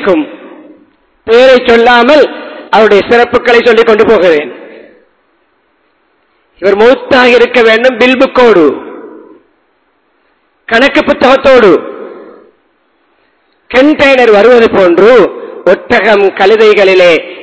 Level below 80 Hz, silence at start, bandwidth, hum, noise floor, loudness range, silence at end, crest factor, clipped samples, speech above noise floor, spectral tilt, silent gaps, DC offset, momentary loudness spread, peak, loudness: -42 dBFS; 0 s; 8 kHz; none; -54 dBFS; 5 LU; 0 s; 8 dB; 9%; 49 dB; -5 dB/octave; none; under 0.1%; 9 LU; 0 dBFS; -5 LUFS